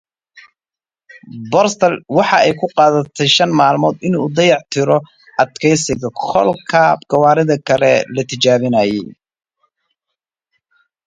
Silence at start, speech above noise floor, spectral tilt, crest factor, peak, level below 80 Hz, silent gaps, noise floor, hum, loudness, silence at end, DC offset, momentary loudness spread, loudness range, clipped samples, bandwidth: 0.35 s; over 76 dB; -4.5 dB/octave; 16 dB; 0 dBFS; -54 dBFS; none; under -90 dBFS; none; -14 LUFS; 1.95 s; under 0.1%; 6 LU; 3 LU; under 0.1%; 9.4 kHz